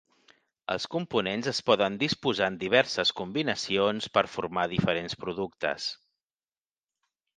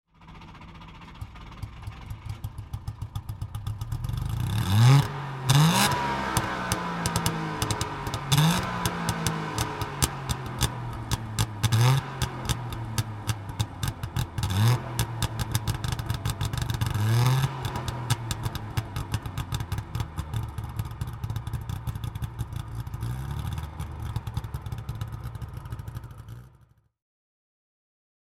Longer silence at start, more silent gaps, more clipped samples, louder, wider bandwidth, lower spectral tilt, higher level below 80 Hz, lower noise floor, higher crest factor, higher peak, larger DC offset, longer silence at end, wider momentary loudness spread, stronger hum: first, 0.7 s vs 0.2 s; neither; neither; about the same, -28 LUFS vs -28 LUFS; second, 9.6 kHz vs 17 kHz; about the same, -4.5 dB/octave vs -4.5 dB/octave; second, -62 dBFS vs -40 dBFS; first, under -90 dBFS vs -59 dBFS; about the same, 24 dB vs 26 dB; second, -6 dBFS vs -2 dBFS; neither; second, 1.4 s vs 1.8 s; second, 9 LU vs 16 LU; neither